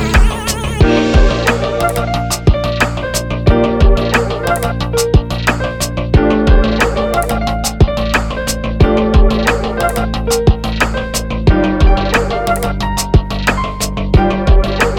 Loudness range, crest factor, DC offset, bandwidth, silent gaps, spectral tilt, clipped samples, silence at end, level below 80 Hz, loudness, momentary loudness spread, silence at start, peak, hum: 1 LU; 12 dB; under 0.1%; 17.5 kHz; none; -5.5 dB/octave; under 0.1%; 0 s; -16 dBFS; -14 LUFS; 6 LU; 0 s; -2 dBFS; none